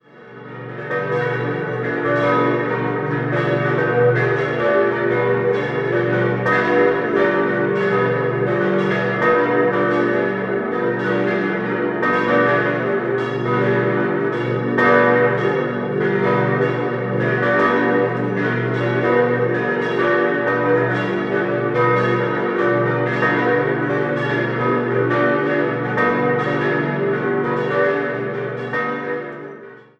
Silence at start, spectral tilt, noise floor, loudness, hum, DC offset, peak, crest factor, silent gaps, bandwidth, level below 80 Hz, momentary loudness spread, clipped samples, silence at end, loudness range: 0.15 s; -8 dB/octave; -39 dBFS; -18 LUFS; none; under 0.1%; -2 dBFS; 16 dB; none; 7.6 kHz; -56 dBFS; 6 LU; under 0.1%; 0.2 s; 2 LU